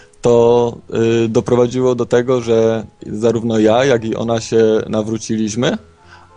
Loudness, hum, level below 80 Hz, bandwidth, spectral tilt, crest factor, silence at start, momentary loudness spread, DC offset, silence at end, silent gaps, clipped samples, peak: -15 LUFS; none; -48 dBFS; 10 kHz; -6 dB/octave; 14 dB; 0.25 s; 7 LU; under 0.1%; 0.2 s; none; under 0.1%; 0 dBFS